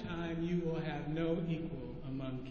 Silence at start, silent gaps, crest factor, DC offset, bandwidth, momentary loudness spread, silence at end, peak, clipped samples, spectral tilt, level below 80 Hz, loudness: 0 s; none; 14 dB; under 0.1%; 6.8 kHz; 8 LU; 0 s; -24 dBFS; under 0.1%; -7 dB/octave; -54 dBFS; -38 LUFS